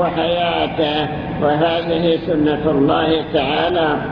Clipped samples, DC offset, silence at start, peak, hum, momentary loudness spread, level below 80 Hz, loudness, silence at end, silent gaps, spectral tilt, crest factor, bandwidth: under 0.1%; under 0.1%; 0 s; -2 dBFS; none; 3 LU; -40 dBFS; -17 LUFS; 0 s; none; -8.5 dB/octave; 14 dB; 5.4 kHz